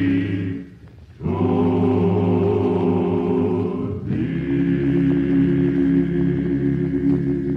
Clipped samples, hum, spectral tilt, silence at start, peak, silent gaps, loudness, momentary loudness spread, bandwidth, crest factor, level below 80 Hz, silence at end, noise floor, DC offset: under 0.1%; none; -10.5 dB/octave; 0 s; -6 dBFS; none; -20 LUFS; 6 LU; 4.8 kHz; 12 dB; -40 dBFS; 0 s; -42 dBFS; under 0.1%